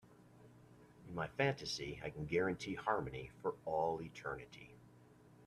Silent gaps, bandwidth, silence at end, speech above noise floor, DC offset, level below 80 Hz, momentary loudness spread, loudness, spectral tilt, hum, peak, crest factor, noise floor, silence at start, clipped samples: none; 13.5 kHz; 0 s; 23 dB; under 0.1%; -66 dBFS; 13 LU; -41 LUFS; -5.5 dB/octave; none; -20 dBFS; 22 dB; -64 dBFS; 0.05 s; under 0.1%